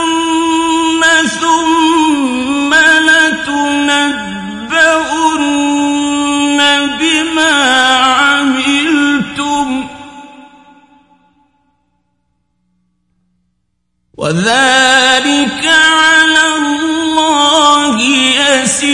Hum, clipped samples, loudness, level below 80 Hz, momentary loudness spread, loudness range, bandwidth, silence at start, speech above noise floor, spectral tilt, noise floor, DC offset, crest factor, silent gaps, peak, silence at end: 60 Hz at -55 dBFS; 0.1%; -9 LUFS; -48 dBFS; 8 LU; 9 LU; 11.5 kHz; 0 s; 57 dB; -2 dB/octave; -66 dBFS; under 0.1%; 12 dB; none; 0 dBFS; 0 s